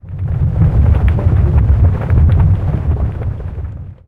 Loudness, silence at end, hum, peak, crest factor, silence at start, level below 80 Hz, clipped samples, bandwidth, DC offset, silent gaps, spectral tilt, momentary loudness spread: -14 LUFS; 0.15 s; none; 0 dBFS; 12 dB; 0.05 s; -16 dBFS; under 0.1%; 3.7 kHz; under 0.1%; none; -11 dB/octave; 12 LU